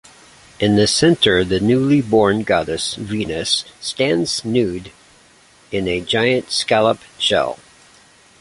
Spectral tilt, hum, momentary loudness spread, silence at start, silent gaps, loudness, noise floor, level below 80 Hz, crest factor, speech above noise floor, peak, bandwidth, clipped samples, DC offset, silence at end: -4.5 dB/octave; none; 10 LU; 0.6 s; none; -17 LUFS; -50 dBFS; -46 dBFS; 16 dB; 33 dB; -2 dBFS; 11.5 kHz; under 0.1%; under 0.1%; 0.85 s